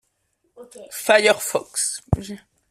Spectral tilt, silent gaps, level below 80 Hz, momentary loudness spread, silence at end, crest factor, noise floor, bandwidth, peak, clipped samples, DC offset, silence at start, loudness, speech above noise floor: -3 dB/octave; none; -42 dBFS; 20 LU; 0.35 s; 20 dB; -70 dBFS; 16 kHz; -2 dBFS; under 0.1%; under 0.1%; 0.55 s; -20 LUFS; 48 dB